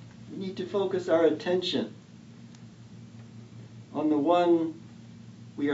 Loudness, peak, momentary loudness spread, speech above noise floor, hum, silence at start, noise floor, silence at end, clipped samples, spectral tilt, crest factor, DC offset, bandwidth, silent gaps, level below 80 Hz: -27 LUFS; -10 dBFS; 25 LU; 23 dB; none; 0 s; -49 dBFS; 0 s; under 0.1%; -6.5 dB/octave; 18 dB; under 0.1%; 8 kHz; none; -72 dBFS